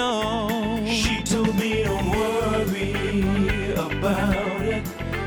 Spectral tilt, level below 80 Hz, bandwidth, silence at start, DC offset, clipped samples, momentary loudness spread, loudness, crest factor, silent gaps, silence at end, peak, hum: -5 dB/octave; -36 dBFS; over 20 kHz; 0 s; under 0.1%; under 0.1%; 3 LU; -23 LUFS; 14 dB; none; 0 s; -8 dBFS; none